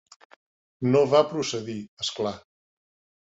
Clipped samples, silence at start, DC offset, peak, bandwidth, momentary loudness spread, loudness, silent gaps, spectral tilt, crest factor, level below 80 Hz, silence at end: under 0.1%; 0.8 s; under 0.1%; -6 dBFS; 8 kHz; 14 LU; -25 LUFS; 1.88-1.97 s; -5 dB/octave; 22 dB; -66 dBFS; 0.85 s